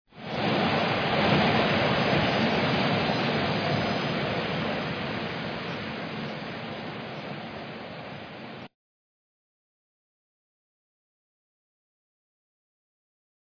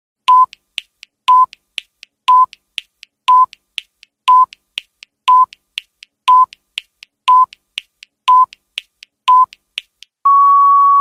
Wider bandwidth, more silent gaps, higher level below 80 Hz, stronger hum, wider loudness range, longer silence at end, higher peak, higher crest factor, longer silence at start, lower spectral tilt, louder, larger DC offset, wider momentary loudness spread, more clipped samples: second, 5.4 kHz vs 11.5 kHz; neither; first, -56 dBFS vs -72 dBFS; neither; first, 18 LU vs 1 LU; first, 4.85 s vs 0 s; second, -10 dBFS vs 0 dBFS; first, 20 dB vs 14 dB; second, 0.15 s vs 0.3 s; first, -6.5 dB/octave vs 1.5 dB/octave; second, -27 LUFS vs -12 LUFS; neither; second, 15 LU vs 18 LU; neither